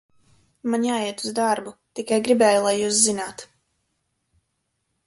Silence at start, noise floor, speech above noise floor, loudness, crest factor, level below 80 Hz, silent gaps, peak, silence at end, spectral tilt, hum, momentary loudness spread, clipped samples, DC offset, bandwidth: 0.65 s; -75 dBFS; 53 dB; -21 LUFS; 20 dB; -66 dBFS; none; -4 dBFS; 1.6 s; -2.5 dB/octave; none; 16 LU; under 0.1%; under 0.1%; 11.5 kHz